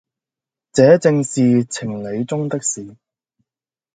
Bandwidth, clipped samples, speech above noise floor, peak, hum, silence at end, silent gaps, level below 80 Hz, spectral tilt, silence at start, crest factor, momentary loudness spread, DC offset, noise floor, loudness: 9.6 kHz; under 0.1%; over 74 dB; 0 dBFS; none; 1.05 s; none; -58 dBFS; -6 dB/octave; 0.75 s; 18 dB; 13 LU; under 0.1%; under -90 dBFS; -17 LUFS